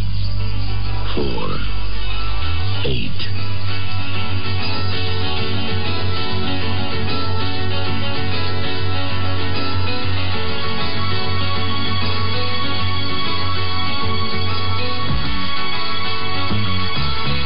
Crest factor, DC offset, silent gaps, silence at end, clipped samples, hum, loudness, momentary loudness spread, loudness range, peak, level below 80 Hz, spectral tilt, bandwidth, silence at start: 10 dB; 20%; none; 0 s; under 0.1%; none; -22 LUFS; 3 LU; 2 LU; -8 dBFS; -32 dBFS; -3.5 dB/octave; 5.4 kHz; 0 s